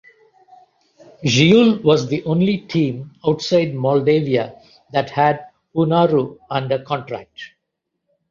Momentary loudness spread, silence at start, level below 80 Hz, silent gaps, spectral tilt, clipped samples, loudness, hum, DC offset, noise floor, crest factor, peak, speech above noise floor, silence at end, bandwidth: 14 LU; 1.2 s; -58 dBFS; none; -6 dB/octave; under 0.1%; -18 LUFS; none; under 0.1%; -77 dBFS; 18 dB; -2 dBFS; 60 dB; 0.85 s; 7.4 kHz